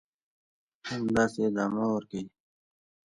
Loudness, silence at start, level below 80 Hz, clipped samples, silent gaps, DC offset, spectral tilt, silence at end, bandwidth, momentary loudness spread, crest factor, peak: -30 LUFS; 0.85 s; -64 dBFS; under 0.1%; none; under 0.1%; -6 dB/octave; 0.85 s; 11 kHz; 14 LU; 20 dB; -12 dBFS